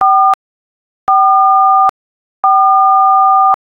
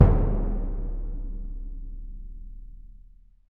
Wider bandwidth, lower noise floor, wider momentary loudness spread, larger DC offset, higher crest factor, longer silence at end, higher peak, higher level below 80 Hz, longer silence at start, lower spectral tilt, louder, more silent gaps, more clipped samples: first, 4.3 kHz vs 2.7 kHz; first, under -90 dBFS vs -52 dBFS; second, 7 LU vs 21 LU; second, under 0.1% vs 0.3%; second, 10 dB vs 26 dB; second, 0.1 s vs 0.5 s; about the same, 0 dBFS vs 0 dBFS; second, -60 dBFS vs -28 dBFS; about the same, 0 s vs 0 s; second, -3.5 dB/octave vs -12 dB/octave; first, -9 LUFS vs -30 LUFS; first, 0.34-1.07 s, 1.89-2.43 s vs none; neither